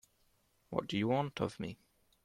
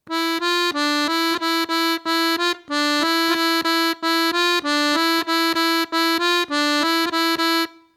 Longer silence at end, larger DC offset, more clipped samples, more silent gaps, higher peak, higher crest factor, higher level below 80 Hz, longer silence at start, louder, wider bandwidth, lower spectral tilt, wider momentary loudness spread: first, 0.5 s vs 0.25 s; neither; neither; neither; second, -18 dBFS vs -4 dBFS; first, 22 dB vs 16 dB; about the same, -68 dBFS vs -70 dBFS; first, 0.7 s vs 0.05 s; second, -37 LUFS vs -19 LUFS; second, 14.5 kHz vs 17 kHz; first, -6.5 dB/octave vs -0.5 dB/octave; first, 12 LU vs 2 LU